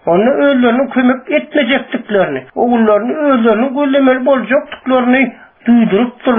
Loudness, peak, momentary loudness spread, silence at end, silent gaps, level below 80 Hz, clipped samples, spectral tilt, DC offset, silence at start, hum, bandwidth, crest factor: -12 LUFS; -2 dBFS; 5 LU; 0 s; none; -52 dBFS; under 0.1%; -4 dB/octave; under 0.1%; 0.05 s; none; 3.7 kHz; 10 dB